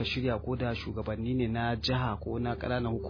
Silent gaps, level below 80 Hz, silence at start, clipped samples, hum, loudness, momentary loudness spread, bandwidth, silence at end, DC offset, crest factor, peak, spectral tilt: none; -44 dBFS; 0 s; under 0.1%; none; -32 LUFS; 4 LU; 5.4 kHz; 0 s; under 0.1%; 14 dB; -18 dBFS; -7.5 dB/octave